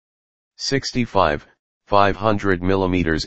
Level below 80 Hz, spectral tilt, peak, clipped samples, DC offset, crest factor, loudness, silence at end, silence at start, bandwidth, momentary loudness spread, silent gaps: -40 dBFS; -5.5 dB/octave; -2 dBFS; under 0.1%; under 0.1%; 20 dB; -20 LUFS; 0 s; 0.5 s; 8.6 kHz; 5 LU; 1.59-1.81 s